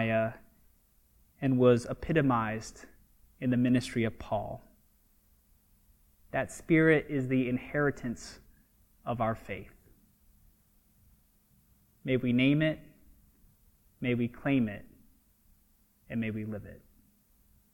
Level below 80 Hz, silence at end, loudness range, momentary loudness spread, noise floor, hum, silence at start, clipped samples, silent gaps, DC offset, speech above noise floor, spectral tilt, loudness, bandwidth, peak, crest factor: -56 dBFS; 0.95 s; 10 LU; 17 LU; -67 dBFS; none; 0 s; under 0.1%; none; under 0.1%; 38 dB; -7 dB/octave; -30 LUFS; 17 kHz; -12 dBFS; 22 dB